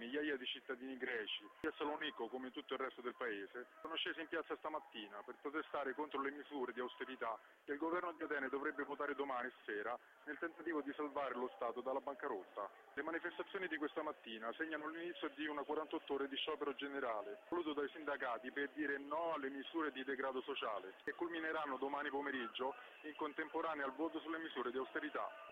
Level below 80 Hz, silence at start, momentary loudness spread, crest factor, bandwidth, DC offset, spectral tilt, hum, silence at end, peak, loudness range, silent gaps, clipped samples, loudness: -84 dBFS; 0 s; 5 LU; 16 dB; 15.5 kHz; under 0.1%; -5 dB/octave; none; 0 s; -28 dBFS; 2 LU; none; under 0.1%; -44 LUFS